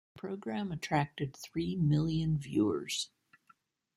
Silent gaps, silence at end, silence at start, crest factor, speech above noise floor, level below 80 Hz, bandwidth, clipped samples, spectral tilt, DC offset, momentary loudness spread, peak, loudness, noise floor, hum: none; 0.9 s; 0.15 s; 18 dB; 36 dB; -60 dBFS; 13 kHz; under 0.1%; -6 dB/octave; under 0.1%; 10 LU; -16 dBFS; -34 LUFS; -69 dBFS; none